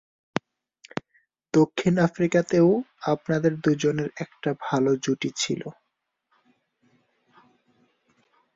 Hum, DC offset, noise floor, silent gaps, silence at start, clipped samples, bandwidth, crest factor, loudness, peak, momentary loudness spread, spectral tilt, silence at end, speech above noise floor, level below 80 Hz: none; under 0.1%; -76 dBFS; none; 1.55 s; under 0.1%; 7.8 kHz; 24 dB; -24 LUFS; -2 dBFS; 12 LU; -6 dB/octave; 2.85 s; 52 dB; -64 dBFS